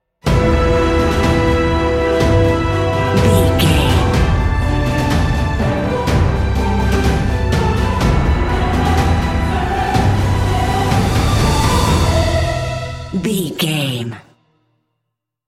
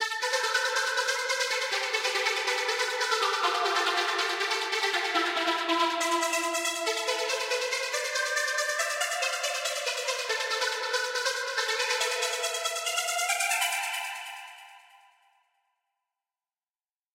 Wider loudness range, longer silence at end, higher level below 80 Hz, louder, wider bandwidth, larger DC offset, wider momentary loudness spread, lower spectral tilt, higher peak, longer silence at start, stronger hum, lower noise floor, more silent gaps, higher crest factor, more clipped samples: about the same, 2 LU vs 4 LU; second, 1.3 s vs 2.35 s; first, -20 dBFS vs -88 dBFS; first, -15 LUFS vs -27 LUFS; about the same, 16 kHz vs 16 kHz; neither; about the same, 5 LU vs 3 LU; first, -6 dB/octave vs 2.5 dB/octave; first, 0 dBFS vs -12 dBFS; first, 0.25 s vs 0 s; neither; second, -76 dBFS vs under -90 dBFS; neither; about the same, 14 dB vs 18 dB; neither